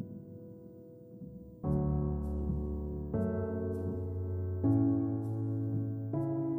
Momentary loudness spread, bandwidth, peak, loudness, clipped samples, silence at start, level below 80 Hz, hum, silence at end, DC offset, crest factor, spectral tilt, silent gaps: 19 LU; 2.1 kHz; -18 dBFS; -34 LUFS; under 0.1%; 0 s; -44 dBFS; none; 0 s; under 0.1%; 16 dB; -12.5 dB/octave; none